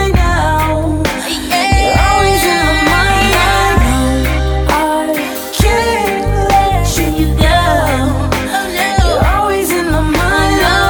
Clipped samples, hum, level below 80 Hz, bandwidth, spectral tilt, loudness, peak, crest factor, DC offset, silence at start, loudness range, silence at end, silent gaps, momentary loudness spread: under 0.1%; none; -18 dBFS; over 20 kHz; -4.5 dB/octave; -12 LUFS; 0 dBFS; 12 dB; under 0.1%; 0 s; 2 LU; 0 s; none; 5 LU